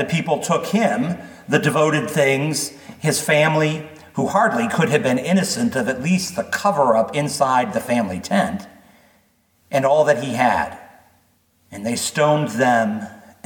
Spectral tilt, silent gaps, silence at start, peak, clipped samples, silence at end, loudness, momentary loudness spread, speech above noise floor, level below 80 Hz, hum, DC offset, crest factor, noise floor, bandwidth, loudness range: -5 dB/octave; none; 0 s; -2 dBFS; under 0.1%; 0.25 s; -19 LUFS; 9 LU; 42 dB; -58 dBFS; none; under 0.1%; 18 dB; -60 dBFS; 19 kHz; 3 LU